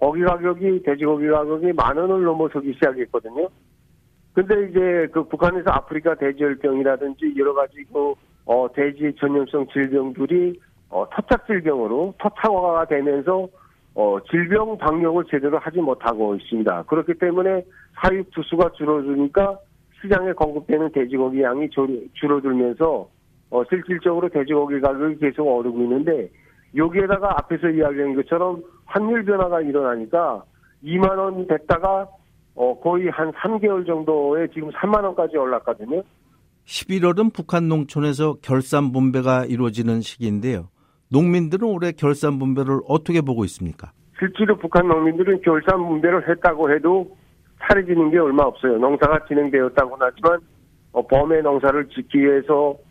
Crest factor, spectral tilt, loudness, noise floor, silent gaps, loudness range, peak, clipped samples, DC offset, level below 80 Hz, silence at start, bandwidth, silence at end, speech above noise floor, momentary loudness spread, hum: 16 dB; -7.5 dB/octave; -20 LUFS; -58 dBFS; none; 4 LU; -2 dBFS; under 0.1%; under 0.1%; -44 dBFS; 0 s; 13 kHz; 0.15 s; 38 dB; 7 LU; none